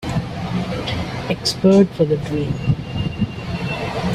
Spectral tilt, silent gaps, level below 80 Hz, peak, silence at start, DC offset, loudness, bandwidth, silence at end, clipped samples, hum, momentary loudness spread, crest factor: -6.5 dB/octave; none; -38 dBFS; -2 dBFS; 0 s; under 0.1%; -20 LUFS; 13.5 kHz; 0 s; under 0.1%; none; 11 LU; 18 dB